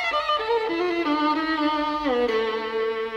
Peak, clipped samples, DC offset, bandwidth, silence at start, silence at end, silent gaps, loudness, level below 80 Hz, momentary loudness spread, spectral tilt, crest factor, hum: -12 dBFS; under 0.1%; under 0.1%; 9.4 kHz; 0 s; 0 s; none; -24 LUFS; -54 dBFS; 3 LU; -4 dB/octave; 12 dB; none